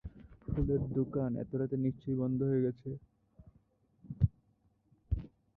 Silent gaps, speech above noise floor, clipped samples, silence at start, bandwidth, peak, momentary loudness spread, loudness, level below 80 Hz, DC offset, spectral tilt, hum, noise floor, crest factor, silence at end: none; 39 dB; under 0.1%; 0.05 s; 3.9 kHz; -16 dBFS; 14 LU; -35 LUFS; -48 dBFS; under 0.1%; -13 dB/octave; none; -72 dBFS; 20 dB; 0.3 s